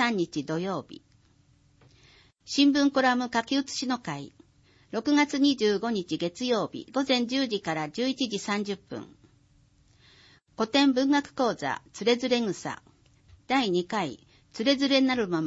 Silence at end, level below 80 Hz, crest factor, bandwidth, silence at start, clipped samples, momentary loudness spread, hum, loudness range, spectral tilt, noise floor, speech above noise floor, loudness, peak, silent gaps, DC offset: 0 s; -66 dBFS; 18 dB; 8 kHz; 0 s; under 0.1%; 13 LU; none; 3 LU; -4 dB/octave; -62 dBFS; 36 dB; -27 LUFS; -10 dBFS; none; under 0.1%